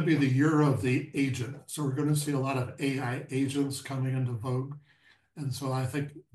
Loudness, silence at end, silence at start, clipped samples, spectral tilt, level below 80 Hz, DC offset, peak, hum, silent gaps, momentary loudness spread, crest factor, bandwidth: -30 LUFS; 0.15 s; 0 s; under 0.1%; -6.5 dB/octave; -70 dBFS; under 0.1%; -12 dBFS; none; none; 11 LU; 18 dB; 12.5 kHz